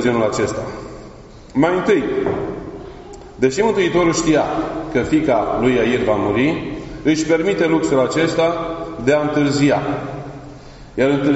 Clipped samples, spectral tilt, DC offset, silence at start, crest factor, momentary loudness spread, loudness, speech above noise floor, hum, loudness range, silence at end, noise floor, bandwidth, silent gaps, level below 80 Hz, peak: under 0.1%; -5 dB/octave; under 0.1%; 0 s; 16 dB; 16 LU; -18 LUFS; 22 dB; none; 3 LU; 0 s; -38 dBFS; 8 kHz; none; -42 dBFS; -2 dBFS